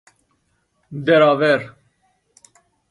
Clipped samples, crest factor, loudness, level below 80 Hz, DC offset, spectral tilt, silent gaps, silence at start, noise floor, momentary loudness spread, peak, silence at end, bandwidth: under 0.1%; 18 dB; -16 LUFS; -66 dBFS; under 0.1%; -6.5 dB/octave; none; 0.9 s; -67 dBFS; 22 LU; -2 dBFS; 1.2 s; 11 kHz